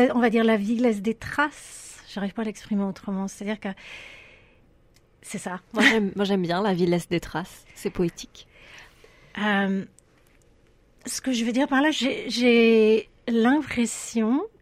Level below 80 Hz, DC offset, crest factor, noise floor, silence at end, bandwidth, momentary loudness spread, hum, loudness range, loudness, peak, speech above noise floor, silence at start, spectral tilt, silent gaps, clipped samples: -54 dBFS; under 0.1%; 20 dB; -58 dBFS; 0.15 s; 14.5 kHz; 20 LU; none; 10 LU; -24 LUFS; -4 dBFS; 35 dB; 0 s; -5 dB/octave; none; under 0.1%